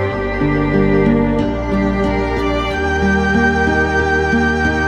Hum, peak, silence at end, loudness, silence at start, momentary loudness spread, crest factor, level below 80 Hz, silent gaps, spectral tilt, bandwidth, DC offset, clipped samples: none; 0 dBFS; 0 s; -15 LUFS; 0 s; 4 LU; 14 dB; -26 dBFS; none; -7 dB/octave; 9.4 kHz; under 0.1%; under 0.1%